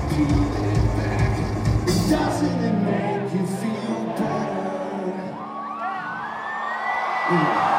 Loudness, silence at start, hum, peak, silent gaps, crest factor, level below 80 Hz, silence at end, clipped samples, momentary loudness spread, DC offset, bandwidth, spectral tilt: -24 LUFS; 0 s; none; -8 dBFS; none; 16 dB; -34 dBFS; 0 s; under 0.1%; 9 LU; under 0.1%; 16 kHz; -6.5 dB/octave